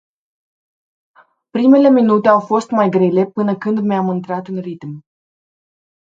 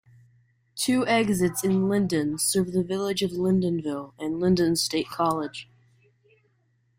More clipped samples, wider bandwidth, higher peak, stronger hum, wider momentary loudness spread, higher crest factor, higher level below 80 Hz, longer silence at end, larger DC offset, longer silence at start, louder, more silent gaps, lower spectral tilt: neither; second, 7.8 kHz vs 16 kHz; first, 0 dBFS vs -10 dBFS; neither; first, 16 LU vs 10 LU; about the same, 16 dB vs 16 dB; second, -66 dBFS vs -60 dBFS; second, 1.15 s vs 1.35 s; neither; first, 1.55 s vs 0.75 s; first, -14 LUFS vs -25 LUFS; neither; first, -8 dB/octave vs -4.5 dB/octave